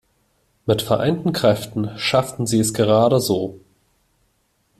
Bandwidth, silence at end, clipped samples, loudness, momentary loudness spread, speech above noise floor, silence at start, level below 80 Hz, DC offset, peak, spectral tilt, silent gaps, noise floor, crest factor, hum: 15.5 kHz; 1.2 s; under 0.1%; -19 LUFS; 8 LU; 47 dB; 0.65 s; -52 dBFS; under 0.1%; -2 dBFS; -5 dB/octave; none; -65 dBFS; 18 dB; none